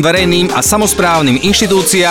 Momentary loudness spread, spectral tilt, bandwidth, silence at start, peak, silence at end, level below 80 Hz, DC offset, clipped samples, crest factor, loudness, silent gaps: 1 LU; -3.5 dB/octave; 18 kHz; 0 s; -2 dBFS; 0 s; -32 dBFS; under 0.1%; under 0.1%; 8 dB; -10 LUFS; none